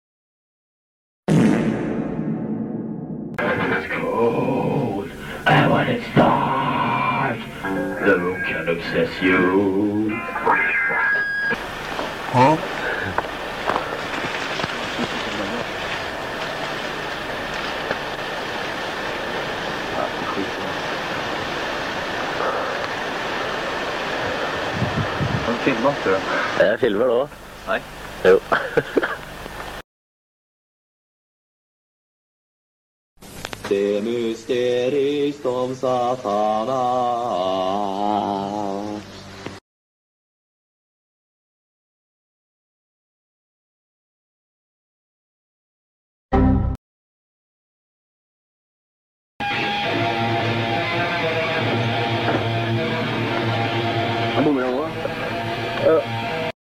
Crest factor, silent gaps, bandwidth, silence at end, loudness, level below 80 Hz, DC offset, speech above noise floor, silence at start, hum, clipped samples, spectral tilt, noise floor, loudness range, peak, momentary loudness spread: 16 dB; 29.84-33.16 s, 39.61-46.29 s, 46.78-49.40 s; 16.5 kHz; 0.15 s; -22 LUFS; -42 dBFS; under 0.1%; over 71 dB; 1.3 s; none; under 0.1%; -5.5 dB/octave; under -90 dBFS; 7 LU; -6 dBFS; 9 LU